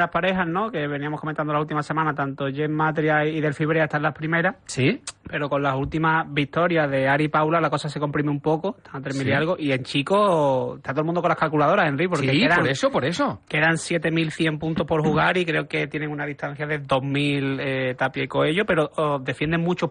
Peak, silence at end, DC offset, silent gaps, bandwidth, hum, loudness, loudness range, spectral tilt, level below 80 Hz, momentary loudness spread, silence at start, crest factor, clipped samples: -8 dBFS; 0 s; under 0.1%; none; 10 kHz; none; -23 LUFS; 3 LU; -6 dB/octave; -54 dBFS; 7 LU; 0 s; 14 dB; under 0.1%